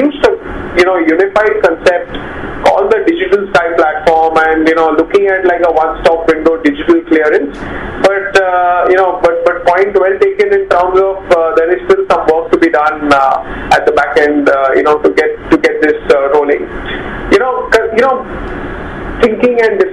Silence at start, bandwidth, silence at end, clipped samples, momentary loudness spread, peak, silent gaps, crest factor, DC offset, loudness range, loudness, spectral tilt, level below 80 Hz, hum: 0 s; 11.5 kHz; 0 s; 0.7%; 8 LU; 0 dBFS; none; 10 dB; 0.4%; 1 LU; -10 LUFS; -5.5 dB/octave; -34 dBFS; none